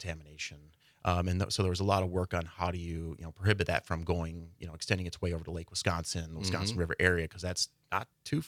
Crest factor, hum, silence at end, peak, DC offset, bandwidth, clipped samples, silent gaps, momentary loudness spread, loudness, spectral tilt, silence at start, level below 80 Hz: 22 dB; none; 0 s; -10 dBFS; under 0.1%; 15 kHz; under 0.1%; none; 12 LU; -33 LUFS; -4.5 dB/octave; 0 s; -54 dBFS